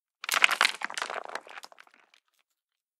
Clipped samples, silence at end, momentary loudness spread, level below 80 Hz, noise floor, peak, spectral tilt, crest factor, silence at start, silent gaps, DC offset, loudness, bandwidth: under 0.1%; 1.4 s; 21 LU; under -90 dBFS; -85 dBFS; -2 dBFS; 2 dB/octave; 30 dB; 0.25 s; none; under 0.1%; -26 LUFS; 16.5 kHz